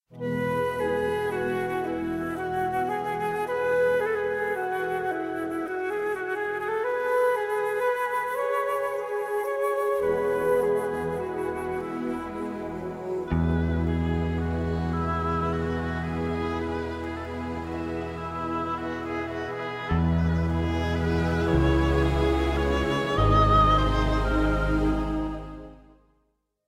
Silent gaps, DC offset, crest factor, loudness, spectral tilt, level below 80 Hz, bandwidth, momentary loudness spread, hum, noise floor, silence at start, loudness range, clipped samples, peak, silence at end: none; under 0.1%; 18 dB; -27 LUFS; -7 dB/octave; -34 dBFS; 15.5 kHz; 9 LU; none; -72 dBFS; 0.1 s; 6 LU; under 0.1%; -8 dBFS; 0.9 s